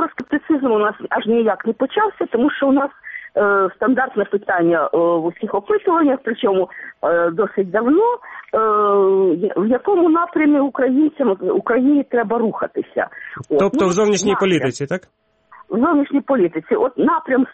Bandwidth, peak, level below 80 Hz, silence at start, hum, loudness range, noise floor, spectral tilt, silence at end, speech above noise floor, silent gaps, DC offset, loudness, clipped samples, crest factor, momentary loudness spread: 8.2 kHz; -4 dBFS; -58 dBFS; 0 s; none; 2 LU; -47 dBFS; -5.5 dB/octave; 0 s; 30 dB; none; under 0.1%; -17 LUFS; under 0.1%; 12 dB; 8 LU